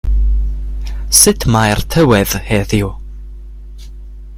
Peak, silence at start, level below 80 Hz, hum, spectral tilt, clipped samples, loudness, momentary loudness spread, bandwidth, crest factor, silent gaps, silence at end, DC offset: 0 dBFS; 0.05 s; -20 dBFS; none; -4 dB/octave; 0.1%; -13 LUFS; 25 LU; 16.5 kHz; 14 dB; none; 0 s; under 0.1%